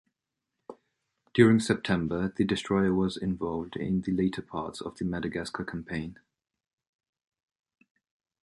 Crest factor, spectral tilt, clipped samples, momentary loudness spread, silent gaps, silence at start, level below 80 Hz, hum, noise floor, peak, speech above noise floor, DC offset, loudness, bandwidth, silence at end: 24 dB; -6.5 dB/octave; under 0.1%; 14 LU; none; 0.7 s; -54 dBFS; none; -86 dBFS; -6 dBFS; 58 dB; under 0.1%; -29 LUFS; 11.5 kHz; 2.35 s